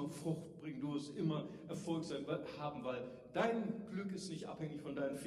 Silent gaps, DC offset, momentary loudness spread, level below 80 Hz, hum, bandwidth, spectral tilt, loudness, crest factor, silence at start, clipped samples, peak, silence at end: none; under 0.1%; 8 LU; -76 dBFS; none; 13.5 kHz; -6 dB/octave; -43 LUFS; 20 dB; 0 s; under 0.1%; -22 dBFS; 0 s